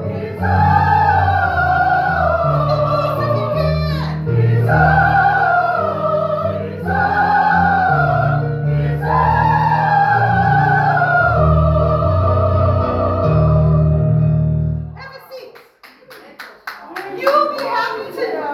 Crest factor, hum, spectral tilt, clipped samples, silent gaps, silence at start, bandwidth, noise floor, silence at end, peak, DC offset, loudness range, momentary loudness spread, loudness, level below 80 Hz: 14 dB; none; -8.5 dB/octave; under 0.1%; none; 0 s; 12.5 kHz; -45 dBFS; 0 s; -2 dBFS; under 0.1%; 7 LU; 10 LU; -15 LUFS; -30 dBFS